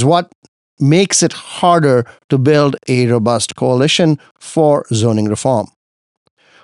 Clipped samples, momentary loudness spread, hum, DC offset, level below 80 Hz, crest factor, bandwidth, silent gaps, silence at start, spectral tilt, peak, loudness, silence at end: under 0.1%; 7 LU; none; under 0.1%; -58 dBFS; 14 dB; 11.5 kHz; 0.35-0.42 s, 0.48-0.77 s, 2.24-2.29 s, 4.31-4.35 s; 0 s; -5 dB/octave; 0 dBFS; -14 LUFS; 1 s